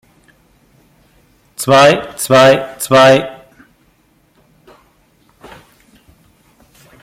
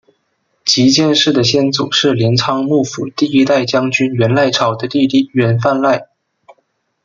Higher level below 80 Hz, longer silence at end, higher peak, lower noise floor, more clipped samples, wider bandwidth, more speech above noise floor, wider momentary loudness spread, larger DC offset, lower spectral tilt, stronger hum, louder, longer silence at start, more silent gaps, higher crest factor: about the same, -54 dBFS vs -56 dBFS; first, 3.7 s vs 1 s; about the same, 0 dBFS vs 0 dBFS; second, -54 dBFS vs -64 dBFS; neither; first, 16.5 kHz vs 7.6 kHz; second, 45 dB vs 52 dB; first, 14 LU vs 5 LU; neither; about the same, -4 dB/octave vs -5 dB/octave; neither; first, -10 LUFS vs -13 LUFS; first, 1.6 s vs 0.65 s; neither; about the same, 16 dB vs 14 dB